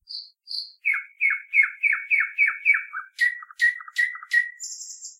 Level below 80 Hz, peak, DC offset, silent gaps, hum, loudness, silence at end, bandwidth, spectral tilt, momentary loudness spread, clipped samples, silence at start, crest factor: -82 dBFS; -8 dBFS; under 0.1%; none; none; -22 LUFS; 0.05 s; 16 kHz; 8.5 dB/octave; 15 LU; under 0.1%; 0.1 s; 18 dB